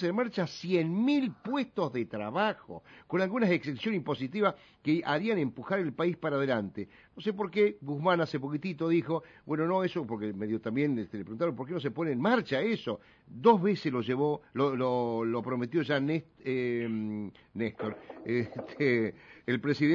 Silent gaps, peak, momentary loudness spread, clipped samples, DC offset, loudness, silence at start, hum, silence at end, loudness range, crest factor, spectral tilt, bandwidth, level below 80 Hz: none; -10 dBFS; 9 LU; under 0.1%; under 0.1%; -31 LUFS; 0 s; none; 0 s; 4 LU; 22 dB; -7.5 dB/octave; 7.4 kHz; -70 dBFS